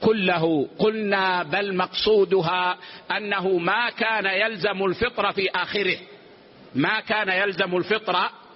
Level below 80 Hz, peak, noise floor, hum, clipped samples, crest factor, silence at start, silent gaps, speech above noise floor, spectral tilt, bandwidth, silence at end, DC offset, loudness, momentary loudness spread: -58 dBFS; -8 dBFS; -48 dBFS; none; under 0.1%; 14 dB; 0 s; none; 26 dB; -2.5 dB/octave; 5.8 kHz; 0.2 s; under 0.1%; -23 LUFS; 5 LU